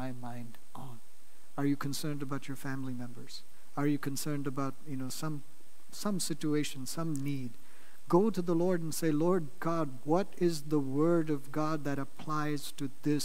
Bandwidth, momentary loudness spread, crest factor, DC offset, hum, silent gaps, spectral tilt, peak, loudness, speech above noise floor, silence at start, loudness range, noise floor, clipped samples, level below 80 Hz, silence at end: 16 kHz; 16 LU; 20 dB; 2%; none; none; -6 dB/octave; -12 dBFS; -34 LUFS; 29 dB; 0 s; 6 LU; -63 dBFS; under 0.1%; -72 dBFS; 0 s